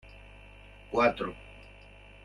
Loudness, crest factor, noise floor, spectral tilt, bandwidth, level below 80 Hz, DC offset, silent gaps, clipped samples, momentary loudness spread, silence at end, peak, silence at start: -29 LUFS; 22 dB; -52 dBFS; -6 dB/octave; 10.5 kHz; -54 dBFS; under 0.1%; none; under 0.1%; 25 LU; 0.55 s; -12 dBFS; 0.05 s